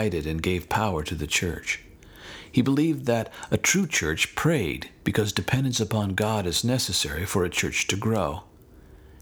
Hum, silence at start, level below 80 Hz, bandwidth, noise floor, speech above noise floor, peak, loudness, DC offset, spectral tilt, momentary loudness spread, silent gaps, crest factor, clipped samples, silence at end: none; 0 s; -44 dBFS; over 20 kHz; -50 dBFS; 25 dB; -6 dBFS; -25 LUFS; under 0.1%; -4 dB/octave; 8 LU; none; 20 dB; under 0.1%; 0.1 s